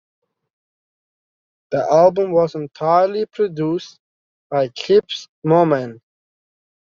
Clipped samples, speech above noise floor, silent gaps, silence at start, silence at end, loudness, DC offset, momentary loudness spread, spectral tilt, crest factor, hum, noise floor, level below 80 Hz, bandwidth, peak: under 0.1%; over 73 dB; 3.99-4.50 s, 5.29-5.42 s; 1.7 s; 1 s; -18 LUFS; under 0.1%; 11 LU; -5.5 dB/octave; 18 dB; none; under -90 dBFS; -64 dBFS; 7.4 kHz; -2 dBFS